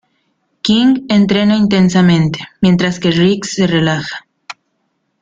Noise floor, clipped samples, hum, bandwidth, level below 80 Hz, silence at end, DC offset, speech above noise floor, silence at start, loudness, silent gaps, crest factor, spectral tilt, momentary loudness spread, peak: -66 dBFS; under 0.1%; none; 7.8 kHz; -46 dBFS; 0.7 s; under 0.1%; 54 dB; 0.65 s; -12 LUFS; none; 14 dB; -6 dB/octave; 18 LU; 0 dBFS